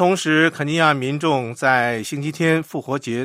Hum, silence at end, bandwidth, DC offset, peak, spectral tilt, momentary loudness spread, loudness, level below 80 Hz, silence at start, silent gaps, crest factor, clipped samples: none; 0 s; 16 kHz; under 0.1%; -2 dBFS; -5 dB/octave; 8 LU; -19 LUFS; -64 dBFS; 0 s; none; 18 dB; under 0.1%